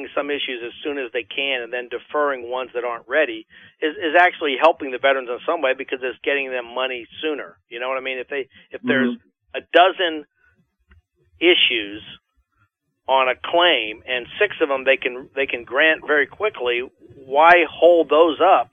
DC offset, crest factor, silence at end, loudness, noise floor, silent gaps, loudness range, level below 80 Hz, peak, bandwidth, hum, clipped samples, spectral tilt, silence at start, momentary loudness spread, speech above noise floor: under 0.1%; 20 dB; 0.1 s; -19 LUFS; -66 dBFS; none; 7 LU; -66 dBFS; 0 dBFS; 5.4 kHz; none; under 0.1%; -5 dB/octave; 0 s; 14 LU; 47 dB